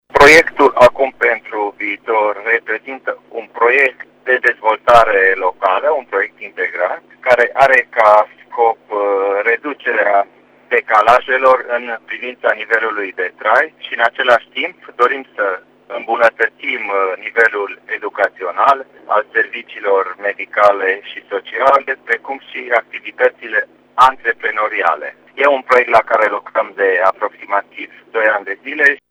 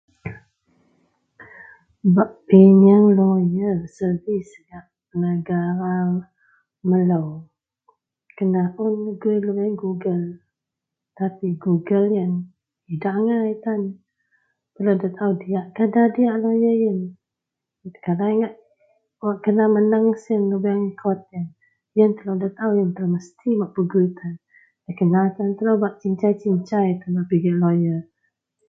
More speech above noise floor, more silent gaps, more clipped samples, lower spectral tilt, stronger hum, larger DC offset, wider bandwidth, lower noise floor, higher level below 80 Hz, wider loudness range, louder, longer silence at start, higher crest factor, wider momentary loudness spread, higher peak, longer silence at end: second, 20 dB vs 65 dB; neither; first, 0.1% vs under 0.1%; second, -3 dB/octave vs -10.5 dB/octave; first, 50 Hz at -70 dBFS vs none; neither; first, 16 kHz vs 6.2 kHz; second, -35 dBFS vs -84 dBFS; first, -48 dBFS vs -64 dBFS; second, 3 LU vs 8 LU; first, -14 LUFS vs -20 LUFS; about the same, 0.15 s vs 0.25 s; second, 14 dB vs 20 dB; about the same, 12 LU vs 12 LU; about the same, 0 dBFS vs 0 dBFS; second, 0.15 s vs 0.65 s